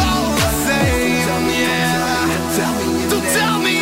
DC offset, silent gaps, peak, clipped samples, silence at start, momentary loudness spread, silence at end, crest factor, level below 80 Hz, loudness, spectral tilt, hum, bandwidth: under 0.1%; none; -4 dBFS; under 0.1%; 0 s; 3 LU; 0 s; 12 dB; -32 dBFS; -16 LUFS; -4 dB/octave; none; 16.5 kHz